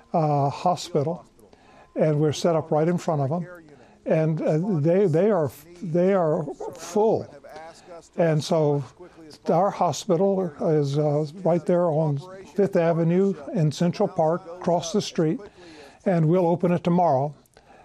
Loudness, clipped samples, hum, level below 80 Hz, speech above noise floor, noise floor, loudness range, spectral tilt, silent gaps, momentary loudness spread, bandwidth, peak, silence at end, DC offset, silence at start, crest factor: -23 LUFS; under 0.1%; none; -64 dBFS; 30 dB; -52 dBFS; 2 LU; -7 dB/octave; none; 11 LU; 13.5 kHz; -10 dBFS; 0.5 s; under 0.1%; 0.15 s; 14 dB